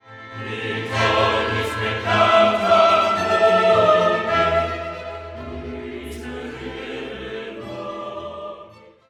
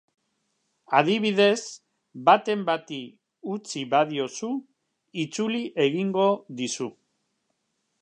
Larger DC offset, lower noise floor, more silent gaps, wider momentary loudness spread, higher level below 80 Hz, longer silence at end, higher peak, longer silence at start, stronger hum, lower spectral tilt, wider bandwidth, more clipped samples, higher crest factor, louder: neither; second, -45 dBFS vs -76 dBFS; neither; about the same, 18 LU vs 16 LU; first, -46 dBFS vs -80 dBFS; second, 0.35 s vs 1.1 s; about the same, -2 dBFS vs -4 dBFS; second, 0.05 s vs 0.9 s; neither; about the same, -5 dB/octave vs -4.5 dB/octave; first, 13 kHz vs 10 kHz; neither; about the same, 18 dB vs 22 dB; first, -18 LUFS vs -25 LUFS